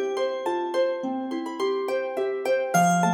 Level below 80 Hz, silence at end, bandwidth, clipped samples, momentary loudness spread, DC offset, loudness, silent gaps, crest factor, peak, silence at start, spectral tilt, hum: -84 dBFS; 0 s; 17.5 kHz; under 0.1%; 8 LU; under 0.1%; -26 LUFS; none; 16 dB; -10 dBFS; 0 s; -5 dB/octave; none